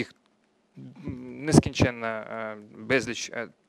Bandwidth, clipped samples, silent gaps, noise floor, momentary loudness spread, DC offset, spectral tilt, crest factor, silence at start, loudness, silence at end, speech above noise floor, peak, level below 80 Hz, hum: 14 kHz; under 0.1%; none; -67 dBFS; 18 LU; under 0.1%; -5.5 dB/octave; 28 dB; 0 s; -27 LUFS; 0.2 s; 41 dB; 0 dBFS; -50 dBFS; none